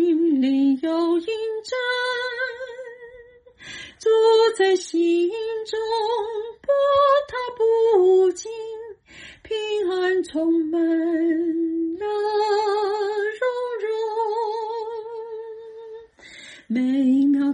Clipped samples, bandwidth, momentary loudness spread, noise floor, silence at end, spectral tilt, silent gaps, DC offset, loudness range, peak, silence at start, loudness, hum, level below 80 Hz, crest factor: under 0.1%; 10 kHz; 20 LU; -47 dBFS; 0 s; -4 dB/octave; none; under 0.1%; 6 LU; -8 dBFS; 0 s; -22 LUFS; none; -64 dBFS; 14 dB